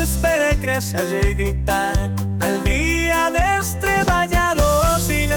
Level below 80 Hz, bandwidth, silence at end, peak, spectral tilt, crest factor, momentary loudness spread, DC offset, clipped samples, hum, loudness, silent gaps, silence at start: -24 dBFS; 19.5 kHz; 0 s; -6 dBFS; -4.5 dB/octave; 12 dB; 4 LU; under 0.1%; under 0.1%; none; -19 LUFS; none; 0 s